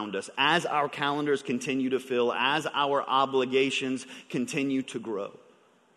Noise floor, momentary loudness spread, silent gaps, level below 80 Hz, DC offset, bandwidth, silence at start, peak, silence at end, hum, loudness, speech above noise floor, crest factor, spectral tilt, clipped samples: -61 dBFS; 10 LU; none; -76 dBFS; under 0.1%; 12 kHz; 0 s; -10 dBFS; 0.6 s; none; -28 LUFS; 33 dB; 20 dB; -4 dB/octave; under 0.1%